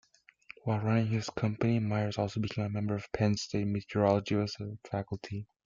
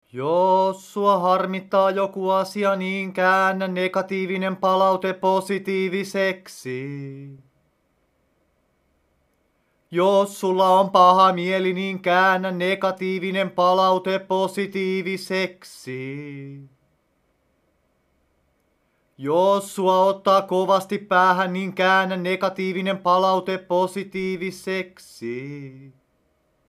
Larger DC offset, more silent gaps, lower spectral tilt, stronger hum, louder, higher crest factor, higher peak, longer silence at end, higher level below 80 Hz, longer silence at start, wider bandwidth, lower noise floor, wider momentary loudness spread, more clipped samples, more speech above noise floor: neither; neither; first, -7 dB/octave vs -5.5 dB/octave; neither; second, -32 LUFS vs -21 LUFS; about the same, 20 dB vs 20 dB; second, -12 dBFS vs -2 dBFS; second, 0.2 s vs 0.8 s; first, -62 dBFS vs -72 dBFS; first, 0.65 s vs 0.15 s; second, 7.4 kHz vs 15 kHz; second, -56 dBFS vs -67 dBFS; second, 10 LU vs 15 LU; neither; second, 25 dB vs 46 dB